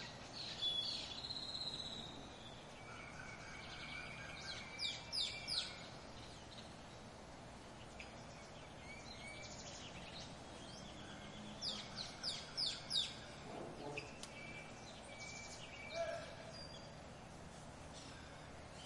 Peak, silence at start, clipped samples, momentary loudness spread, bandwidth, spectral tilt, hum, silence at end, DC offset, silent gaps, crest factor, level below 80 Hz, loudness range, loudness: -26 dBFS; 0 s; under 0.1%; 14 LU; 11.5 kHz; -2.5 dB/octave; none; 0 s; under 0.1%; none; 22 dB; -66 dBFS; 9 LU; -47 LUFS